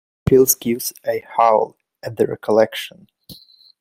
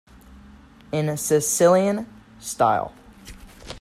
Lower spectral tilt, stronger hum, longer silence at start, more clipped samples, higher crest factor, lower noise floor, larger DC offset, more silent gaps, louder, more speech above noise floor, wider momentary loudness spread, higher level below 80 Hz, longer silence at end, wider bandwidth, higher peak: about the same, -4.5 dB/octave vs -4.5 dB/octave; neither; about the same, 0.25 s vs 0.3 s; neither; about the same, 20 dB vs 18 dB; about the same, -44 dBFS vs -47 dBFS; neither; neither; first, -18 LUFS vs -21 LUFS; about the same, 27 dB vs 27 dB; second, 16 LU vs 19 LU; about the same, -48 dBFS vs -52 dBFS; first, 0.45 s vs 0.05 s; about the same, 16.5 kHz vs 16 kHz; first, 0 dBFS vs -4 dBFS